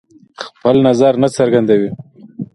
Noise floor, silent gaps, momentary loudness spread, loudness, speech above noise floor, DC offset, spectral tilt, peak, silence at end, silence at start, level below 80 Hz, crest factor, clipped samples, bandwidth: -33 dBFS; none; 19 LU; -13 LUFS; 21 dB; under 0.1%; -6.5 dB/octave; 0 dBFS; 0.1 s; 0.4 s; -54 dBFS; 14 dB; under 0.1%; 11.5 kHz